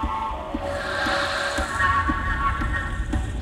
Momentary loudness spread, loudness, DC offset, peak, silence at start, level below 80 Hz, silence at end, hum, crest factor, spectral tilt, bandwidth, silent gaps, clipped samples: 8 LU; -24 LUFS; under 0.1%; -8 dBFS; 0 s; -30 dBFS; 0 s; none; 16 dB; -4.5 dB/octave; 15 kHz; none; under 0.1%